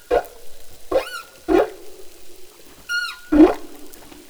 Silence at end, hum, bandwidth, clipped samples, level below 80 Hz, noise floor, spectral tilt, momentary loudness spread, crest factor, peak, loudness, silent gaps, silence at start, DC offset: 0.1 s; none; over 20 kHz; under 0.1%; -42 dBFS; -39 dBFS; -4.5 dB/octave; 27 LU; 20 dB; 0 dBFS; -20 LUFS; none; 0.1 s; under 0.1%